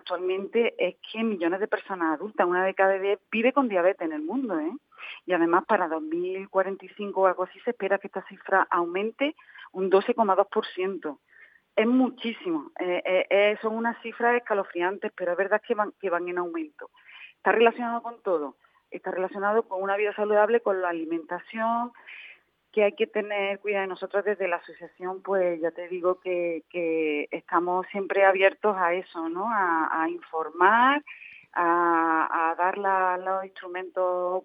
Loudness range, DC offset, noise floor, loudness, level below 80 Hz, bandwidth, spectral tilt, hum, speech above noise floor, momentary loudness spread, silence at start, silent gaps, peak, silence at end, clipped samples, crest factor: 5 LU; under 0.1%; -56 dBFS; -26 LUFS; -88 dBFS; 5 kHz; -8 dB/octave; none; 30 dB; 11 LU; 0.05 s; none; -4 dBFS; 0.05 s; under 0.1%; 22 dB